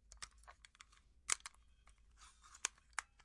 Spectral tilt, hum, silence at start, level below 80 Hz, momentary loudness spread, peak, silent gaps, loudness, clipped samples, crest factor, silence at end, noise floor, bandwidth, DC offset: 1.5 dB/octave; none; 0.1 s; -70 dBFS; 23 LU; -16 dBFS; none; -45 LUFS; under 0.1%; 36 dB; 0.2 s; -68 dBFS; 12 kHz; under 0.1%